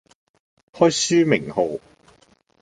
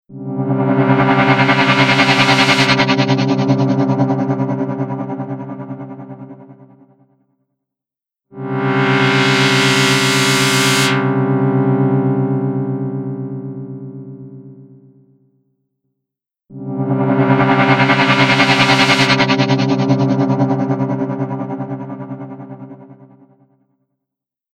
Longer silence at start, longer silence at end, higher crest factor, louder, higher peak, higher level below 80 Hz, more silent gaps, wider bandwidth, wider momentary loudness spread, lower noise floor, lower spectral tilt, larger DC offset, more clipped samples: first, 0.75 s vs 0.1 s; second, 0.85 s vs 1.6 s; about the same, 20 dB vs 16 dB; second, -19 LUFS vs -14 LUFS; about the same, -2 dBFS vs 0 dBFS; second, -60 dBFS vs -54 dBFS; neither; second, 9.6 kHz vs 16 kHz; second, 9 LU vs 18 LU; second, -58 dBFS vs -87 dBFS; about the same, -4 dB/octave vs -5 dB/octave; neither; neither